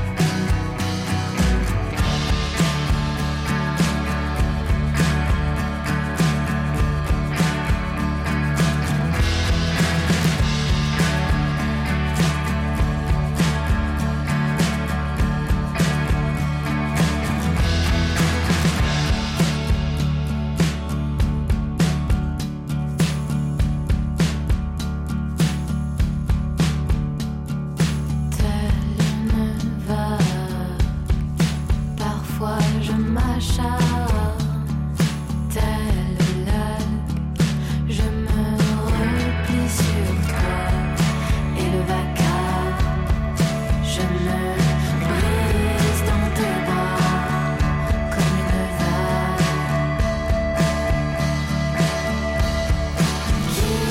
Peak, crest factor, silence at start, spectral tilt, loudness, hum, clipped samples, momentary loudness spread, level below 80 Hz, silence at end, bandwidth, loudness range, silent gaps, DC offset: -10 dBFS; 12 dB; 0 s; -6 dB/octave; -22 LUFS; none; under 0.1%; 4 LU; -26 dBFS; 0 s; 16.5 kHz; 2 LU; none; under 0.1%